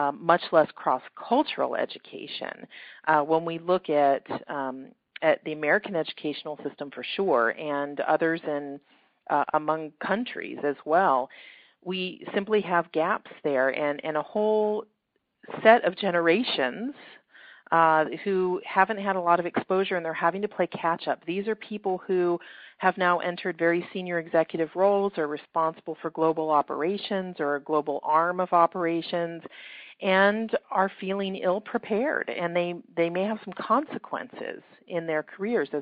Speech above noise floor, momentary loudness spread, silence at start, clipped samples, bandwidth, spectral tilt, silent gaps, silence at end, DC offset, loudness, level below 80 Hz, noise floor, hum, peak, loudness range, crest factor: 50 dB; 12 LU; 0 s; under 0.1%; 4.9 kHz; -3 dB/octave; none; 0 s; under 0.1%; -26 LUFS; -72 dBFS; -76 dBFS; none; -2 dBFS; 3 LU; 24 dB